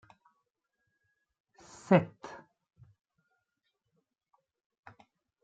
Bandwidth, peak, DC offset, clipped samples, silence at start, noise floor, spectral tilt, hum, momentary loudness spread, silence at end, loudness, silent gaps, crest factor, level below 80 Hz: 8.4 kHz; -8 dBFS; under 0.1%; under 0.1%; 1.9 s; -83 dBFS; -7.5 dB/octave; none; 26 LU; 3.15 s; -28 LUFS; none; 30 dB; -78 dBFS